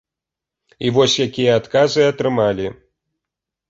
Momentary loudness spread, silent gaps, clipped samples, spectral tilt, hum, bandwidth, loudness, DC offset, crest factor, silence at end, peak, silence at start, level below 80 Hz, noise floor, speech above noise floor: 9 LU; none; under 0.1%; -4.5 dB/octave; none; 8 kHz; -17 LUFS; under 0.1%; 16 dB; 0.95 s; -2 dBFS; 0.8 s; -52 dBFS; -86 dBFS; 69 dB